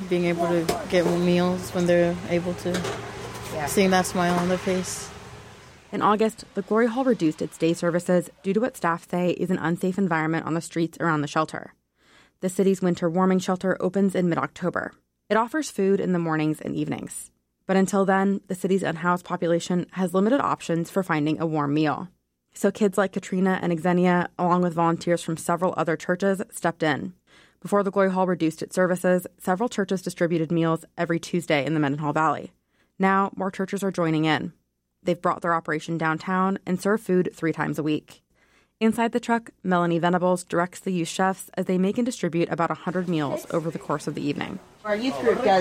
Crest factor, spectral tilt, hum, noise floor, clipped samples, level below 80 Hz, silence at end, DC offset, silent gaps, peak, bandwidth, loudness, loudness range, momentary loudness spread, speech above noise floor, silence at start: 16 dB; -6 dB/octave; none; -62 dBFS; under 0.1%; -58 dBFS; 0 s; under 0.1%; none; -8 dBFS; 16 kHz; -24 LUFS; 2 LU; 7 LU; 39 dB; 0 s